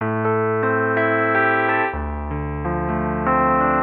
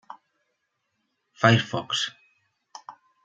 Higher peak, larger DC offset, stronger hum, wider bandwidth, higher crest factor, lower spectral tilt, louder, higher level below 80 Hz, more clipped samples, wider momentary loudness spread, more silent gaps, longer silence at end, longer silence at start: second, -8 dBFS vs -2 dBFS; neither; neither; second, 4.2 kHz vs 9 kHz; second, 10 dB vs 26 dB; first, -10.5 dB/octave vs -4.5 dB/octave; first, -20 LUFS vs -23 LUFS; first, -34 dBFS vs -68 dBFS; neither; second, 9 LU vs 25 LU; neither; second, 0 s vs 0.35 s; second, 0 s vs 1.4 s